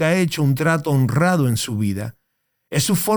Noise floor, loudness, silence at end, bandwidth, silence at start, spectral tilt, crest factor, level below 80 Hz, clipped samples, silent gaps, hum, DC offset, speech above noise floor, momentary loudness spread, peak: -73 dBFS; -19 LUFS; 0 s; over 20 kHz; 0 s; -5.5 dB/octave; 14 dB; -56 dBFS; under 0.1%; none; none; under 0.1%; 54 dB; 8 LU; -4 dBFS